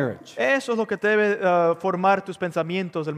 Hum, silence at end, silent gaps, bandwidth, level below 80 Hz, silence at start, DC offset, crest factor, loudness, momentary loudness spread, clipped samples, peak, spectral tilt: none; 0 s; none; 13.5 kHz; -74 dBFS; 0 s; under 0.1%; 16 dB; -22 LUFS; 7 LU; under 0.1%; -6 dBFS; -6 dB/octave